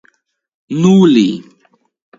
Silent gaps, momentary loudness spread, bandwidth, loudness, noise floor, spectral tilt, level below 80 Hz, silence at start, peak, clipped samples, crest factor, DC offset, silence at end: none; 15 LU; 7.6 kHz; -11 LUFS; -60 dBFS; -7 dB/octave; -58 dBFS; 0.7 s; 0 dBFS; under 0.1%; 14 dB; under 0.1%; 0.8 s